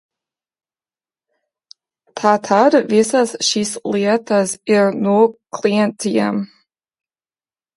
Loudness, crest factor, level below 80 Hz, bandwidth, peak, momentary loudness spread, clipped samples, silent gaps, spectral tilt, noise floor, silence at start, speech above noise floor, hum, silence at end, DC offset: -16 LUFS; 18 dB; -66 dBFS; 11.5 kHz; 0 dBFS; 8 LU; under 0.1%; none; -4.5 dB/octave; under -90 dBFS; 2.15 s; over 74 dB; none; 1.3 s; under 0.1%